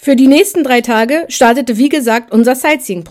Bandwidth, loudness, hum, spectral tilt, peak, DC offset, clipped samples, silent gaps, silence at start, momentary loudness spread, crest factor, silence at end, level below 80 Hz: 16 kHz; -10 LUFS; none; -3.5 dB/octave; 0 dBFS; under 0.1%; 0.8%; none; 0.05 s; 5 LU; 10 dB; 0.05 s; -52 dBFS